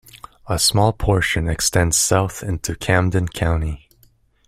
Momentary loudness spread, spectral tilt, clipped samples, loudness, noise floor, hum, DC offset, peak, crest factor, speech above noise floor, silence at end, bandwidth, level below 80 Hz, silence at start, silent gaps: 10 LU; -4 dB/octave; under 0.1%; -19 LUFS; -56 dBFS; none; under 0.1%; -2 dBFS; 18 dB; 37 dB; 0.7 s; 16 kHz; -34 dBFS; 0.15 s; none